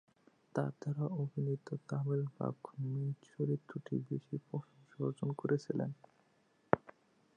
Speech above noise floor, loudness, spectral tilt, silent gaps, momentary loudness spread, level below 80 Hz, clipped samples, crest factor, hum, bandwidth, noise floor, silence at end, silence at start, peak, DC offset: 35 dB; -39 LUFS; -9 dB/octave; none; 7 LU; -76 dBFS; under 0.1%; 32 dB; none; 9 kHz; -73 dBFS; 0.45 s; 0.55 s; -8 dBFS; under 0.1%